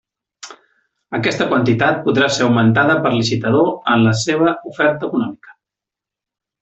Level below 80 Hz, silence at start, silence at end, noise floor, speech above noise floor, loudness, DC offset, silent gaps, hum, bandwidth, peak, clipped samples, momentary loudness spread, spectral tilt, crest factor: -54 dBFS; 0.45 s; 1.1 s; -86 dBFS; 71 dB; -16 LUFS; under 0.1%; none; none; 8.2 kHz; -2 dBFS; under 0.1%; 10 LU; -5.5 dB/octave; 14 dB